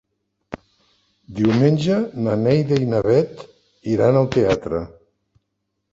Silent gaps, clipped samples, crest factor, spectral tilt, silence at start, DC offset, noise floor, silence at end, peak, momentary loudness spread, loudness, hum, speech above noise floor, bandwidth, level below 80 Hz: none; under 0.1%; 18 dB; -8 dB/octave; 0.5 s; under 0.1%; -75 dBFS; 1.05 s; -2 dBFS; 21 LU; -19 LUFS; none; 58 dB; 7.8 kHz; -48 dBFS